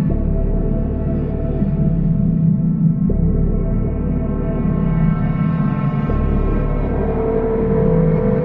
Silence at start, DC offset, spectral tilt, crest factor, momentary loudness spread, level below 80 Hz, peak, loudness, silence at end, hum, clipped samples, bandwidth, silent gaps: 0 s; under 0.1%; -13 dB/octave; 12 dB; 5 LU; -22 dBFS; -4 dBFS; -18 LUFS; 0 s; none; under 0.1%; 3.4 kHz; none